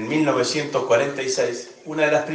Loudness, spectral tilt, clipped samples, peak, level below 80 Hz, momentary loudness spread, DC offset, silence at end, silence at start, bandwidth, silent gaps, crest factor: -21 LUFS; -4 dB/octave; under 0.1%; -6 dBFS; -68 dBFS; 7 LU; under 0.1%; 0 s; 0 s; 10 kHz; none; 14 dB